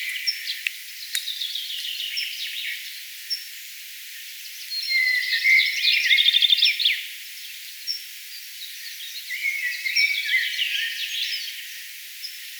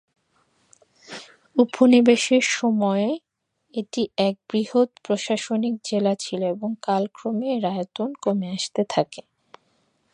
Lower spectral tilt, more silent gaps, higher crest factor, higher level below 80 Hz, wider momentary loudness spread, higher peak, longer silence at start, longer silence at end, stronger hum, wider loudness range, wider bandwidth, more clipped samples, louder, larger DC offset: second, 13.5 dB/octave vs -4.5 dB/octave; neither; about the same, 24 dB vs 20 dB; second, under -90 dBFS vs -72 dBFS; first, 18 LU vs 14 LU; about the same, -2 dBFS vs -2 dBFS; second, 0 s vs 1.1 s; second, 0 s vs 0.95 s; neither; first, 10 LU vs 5 LU; first, over 20 kHz vs 10.5 kHz; neither; about the same, -21 LUFS vs -22 LUFS; neither